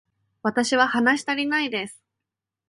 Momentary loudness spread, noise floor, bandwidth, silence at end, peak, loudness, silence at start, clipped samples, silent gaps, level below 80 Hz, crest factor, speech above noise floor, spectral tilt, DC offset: 10 LU; -86 dBFS; 11.5 kHz; 0.75 s; -6 dBFS; -22 LUFS; 0.45 s; under 0.1%; none; -70 dBFS; 18 dB; 64 dB; -3 dB/octave; under 0.1%